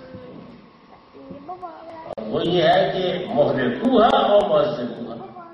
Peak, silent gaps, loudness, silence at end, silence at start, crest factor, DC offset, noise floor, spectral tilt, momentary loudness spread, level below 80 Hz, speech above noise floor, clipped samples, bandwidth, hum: -2 dBFS; none; -19 LUFS; 0 s; 0 s; 18 dB; under 0.1%; -48 dBFS; -7 dB/octave; 23 LU; -54 dBFS; 30 dB; under 0.1%; 8.4 kHz; none